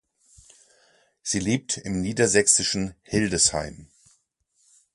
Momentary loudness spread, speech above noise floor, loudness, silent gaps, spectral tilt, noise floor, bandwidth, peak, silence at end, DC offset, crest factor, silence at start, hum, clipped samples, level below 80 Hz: 12 LU; 45 dB; -22 LUFS; none; -3 dB/octave; -69 dBFS; 11.5 kHz; -4 dBFS; 1.1 s; under 0.1%; 24 dB; 1.25 s; none; under 0.1%; -50 dBFS